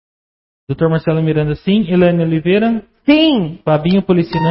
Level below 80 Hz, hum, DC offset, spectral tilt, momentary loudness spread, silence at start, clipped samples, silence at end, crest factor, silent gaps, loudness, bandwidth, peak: -42 dBFS; none; under 0.1%; -12 dB/octave; 6 LU; 0.7 s; under 0.1%; 0 s; 14 dB; none; -14 LUFS; 5.8 kHz; 0 dBFS